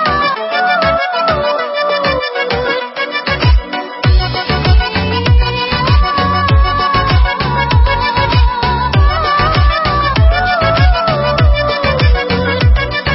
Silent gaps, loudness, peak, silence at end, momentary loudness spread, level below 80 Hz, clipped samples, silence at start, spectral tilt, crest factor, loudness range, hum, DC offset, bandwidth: none; -12 LUFS; 0 dBFS; 0 s; 4 LU; -16 dBFS; under 0.1%; 0 s; -9.5 dB/octave; 12 dB; 2 LU; none; under 0.1%; 5.8 kHz